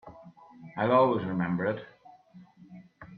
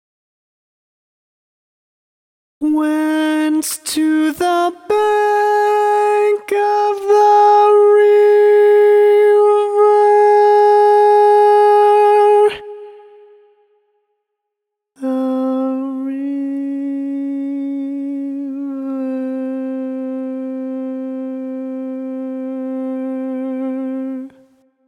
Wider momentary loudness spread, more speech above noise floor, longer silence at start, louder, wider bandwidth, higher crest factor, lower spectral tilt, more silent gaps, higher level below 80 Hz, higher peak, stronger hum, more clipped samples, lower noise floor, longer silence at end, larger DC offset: first, 23 LU vs 15 LU; second, 28 dB vs 63 dB; second, 0.05 s vs 2.6 s; second, -27 LUFS vs -14 LUFS; second, 4.8 kHz vs 16.5 kHz; first, 20 dB vs 12 dB; first, -10 dB/octave vs -3 dB/octave; neither; about the same, -68 dBFS vs -66 dBFS; second, -10 dBFS vs -2 dBFS; neither; neither; second, -54 dBFS vs -79 dBFS; second, 0 s vs 0.6 s; neither